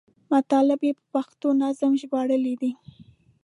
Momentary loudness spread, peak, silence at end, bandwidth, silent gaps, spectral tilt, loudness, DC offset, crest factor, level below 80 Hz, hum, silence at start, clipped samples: 9 LU; -10 dBFS; 0.7 s; 11 kHz; none; -6 dB/octave; -24 LUFS; under 0.1%; 14 dB; -72 dBFS; none; 0.3 s; under 0.1%